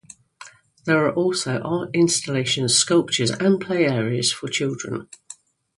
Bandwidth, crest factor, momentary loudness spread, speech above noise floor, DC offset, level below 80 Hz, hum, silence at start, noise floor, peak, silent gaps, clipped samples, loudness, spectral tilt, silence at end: 11.5 kHz; 18 dB; 13 LU; 25 dB; under 0.1%; -62 dBFS; none; 0.4 s; -46 dBFS; -4 dBFS; none; under 0.1%; -21 LUFS; -4 dB/octave; 0.45 s